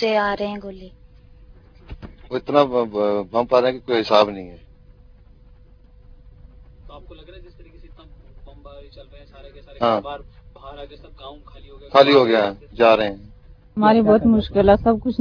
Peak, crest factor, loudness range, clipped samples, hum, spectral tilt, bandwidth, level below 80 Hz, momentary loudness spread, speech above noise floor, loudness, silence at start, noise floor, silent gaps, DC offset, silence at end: 0 dBFS; 22 dB; 12 LU; under 0.1%; none; -7 dB/octave; 5.4 kHz; -42 dBFS; 25 LU; 29 dB; -18 LUFS; 0 s; -48 dBFS; none; under 0.1%; 0 s